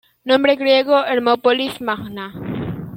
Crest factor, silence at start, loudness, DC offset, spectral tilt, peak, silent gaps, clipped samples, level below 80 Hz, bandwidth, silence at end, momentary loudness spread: 16 dB; 0.25 s; -17 LUFS; under 0.1%; -6 dB/octave; -2 dBFS; none; under 0.1%; -54 dBFS; 16.5 kHz; 0 s; 13 LU